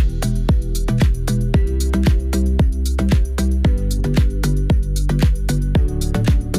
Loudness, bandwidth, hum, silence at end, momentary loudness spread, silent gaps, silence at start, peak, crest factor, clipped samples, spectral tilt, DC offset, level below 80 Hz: -19 LUFS; 15.5 kHz; none; 0 s; 3 LU; none; 0 s; -6 dBFS; 10 dB; under 0.1%; -6.5 dB/octave; under 0.1%; -18 dBFS